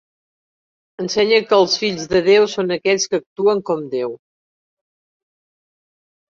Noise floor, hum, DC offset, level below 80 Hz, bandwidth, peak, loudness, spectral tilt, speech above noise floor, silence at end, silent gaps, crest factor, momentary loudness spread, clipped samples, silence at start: under -90 dBFS; none; under 0.1%; -58 dBFS; 7.6 kHz; -2 dBFS; -17 LUFS; -3.5 dB/octave; over 73 dB; 2.15 s; 3.26-3.36 s; 18 dB; 10 LU; under 0.1%; 1 s